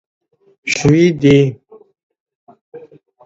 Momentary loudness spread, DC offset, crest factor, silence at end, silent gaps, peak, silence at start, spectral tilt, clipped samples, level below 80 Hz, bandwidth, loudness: 9 LU; under 0.1%; 16 dB; 0.45 s; 2.03-2.10 s, 2.20-2.26 s, 2.35-2.47 s, 2.61-2.72 s; 0 dBFS; 0.65 s; -6 dB/octave; under 0.1%; -46 dBFS; 8 kHz; -13 LUFS